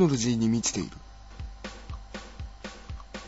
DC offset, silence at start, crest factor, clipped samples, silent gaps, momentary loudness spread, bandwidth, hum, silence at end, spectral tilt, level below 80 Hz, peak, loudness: under 0.1%; 0 s; 20 dB; under 0.1%; none; 19 LU; 8 kHz; none; 0 s; -5 dB/octave; -44 dBFS; -10 dBFS; -30 LUFS